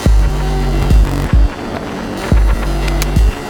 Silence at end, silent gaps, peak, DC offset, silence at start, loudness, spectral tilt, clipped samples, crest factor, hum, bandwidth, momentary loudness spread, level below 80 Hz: 0 s; none; 0 dBFS; under 0.1%; 0 s; -15 LUFS; -6 dB/octave; under 0.1%; 12 dB; none; 16.5 kHz; 9 LU; -14 dBFS